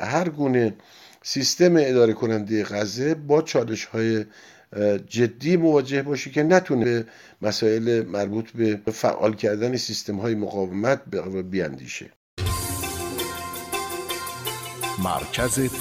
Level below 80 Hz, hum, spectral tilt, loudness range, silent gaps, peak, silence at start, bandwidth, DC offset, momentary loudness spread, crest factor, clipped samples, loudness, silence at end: -48 dBFS; none; -5 dB/octave; 6 LU; 12.16-12.37 s; -4 dBFS; 0 s; 16.5 kHz; under 0.1%; 11 LU; 20 dB; under 0.1%; -23 LUFS; 0 s